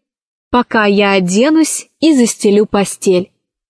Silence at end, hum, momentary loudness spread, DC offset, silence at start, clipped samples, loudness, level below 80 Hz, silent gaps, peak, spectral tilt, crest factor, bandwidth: 0.45 s; none; 5 LU; under 0.1%; 0.55 s; under 0.1%; -12 LUFS; -48 dBFS; none; 0 dBFS; -4.5 dB/octave; 12 dB; 11 kHz